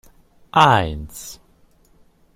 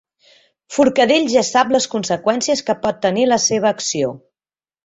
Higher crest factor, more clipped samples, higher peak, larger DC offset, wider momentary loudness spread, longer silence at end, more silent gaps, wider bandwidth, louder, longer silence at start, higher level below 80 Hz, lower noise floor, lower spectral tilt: first, 22 dB vs 16 dB; neither; about the same, 0 dBFS vs -2 dBFS; neither; first, 21 LU vs 6 LU; first, 1 s vs 0.7 s; neither; first, 16.5 kHz vs 8.2 kHz; about the same, -16 LUFS vs -17 LUFS; second, 0.55 s vs 0.7 s; first, -42 dBFS vs -56 dBFS; second, -55 dBFS vs under -90 dBFS; first, -4.5 dB/octave vs -3 dB/octave